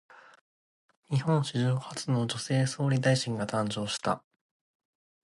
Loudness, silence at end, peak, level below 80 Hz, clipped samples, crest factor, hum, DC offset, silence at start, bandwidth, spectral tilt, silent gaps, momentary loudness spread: -29 LUFS; 1.05 s; -12 dBFS; -66 dBFS; under 0.1%; 18 dB; none; under 0.1%; 0.15 s; 11.5 kHz; -5.5 dB/octave; 0.41-0.89 s, 0.97-1.03 s; 6 LU